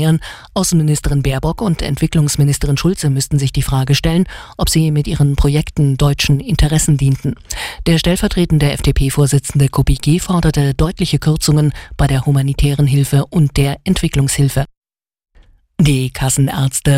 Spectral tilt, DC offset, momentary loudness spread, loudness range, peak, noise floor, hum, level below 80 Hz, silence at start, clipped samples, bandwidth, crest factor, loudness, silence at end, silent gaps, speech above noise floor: -5.5 dB/octave; 0.2%; 4 LU; 2 LU; -2 dBFS; -48 dBFS; none; -24 dBFS; 0 s; under 0.1%; 16 kHz; 12 dB; -15 LUFS; 0 s; 14.77-14.82 s; 34 dB